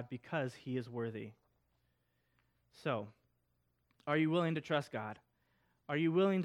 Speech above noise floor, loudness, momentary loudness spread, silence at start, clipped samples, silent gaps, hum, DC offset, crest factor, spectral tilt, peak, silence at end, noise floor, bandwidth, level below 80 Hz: 44 dB; -37 LUFS; 17 LU; 0 s; under 0.1%; none; none; under 0.1%; 20 dB; -7.5 dB/octave; -20 dBFS; 0 s; -80 dBFS; 11.5 kHz; -82 dBFS